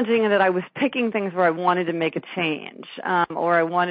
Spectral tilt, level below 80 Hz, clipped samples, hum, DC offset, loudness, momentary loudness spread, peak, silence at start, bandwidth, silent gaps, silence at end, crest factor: -3.5 dB/octave; -72 dBFS; under 0.1%; none; under 0.1%; -22 LUFS; 6 LU; -6 dBFS; 0 s; 4.9 kHz; none; 0 s; 16 dB